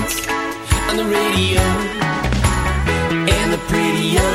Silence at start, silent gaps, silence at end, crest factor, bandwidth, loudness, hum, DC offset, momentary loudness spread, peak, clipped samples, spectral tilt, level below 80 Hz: 0 s; none; 0 s; 14 dB; 16 kHz; -17 LUFS; none; under 0.1%; 4 LU; -2 dBFS; under 0.1%; -4.5 dB/octave; -26 dBFS